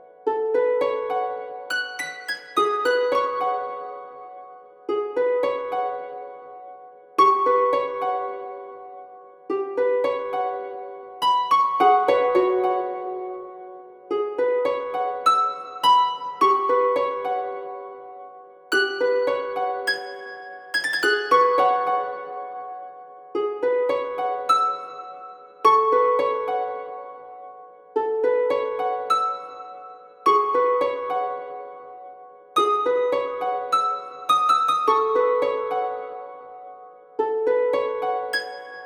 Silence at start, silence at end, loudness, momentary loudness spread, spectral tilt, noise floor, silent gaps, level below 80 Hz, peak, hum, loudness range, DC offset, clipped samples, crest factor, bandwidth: 0.25 s; 0 s; -22 LUFS; 21 LU; -2.5 dB/octave; -44 dBFS; none; -78 dBFS; -4 dBFS; none; 4 LU; under 0.1%; under 0.1%; 20 dB; 17 kHz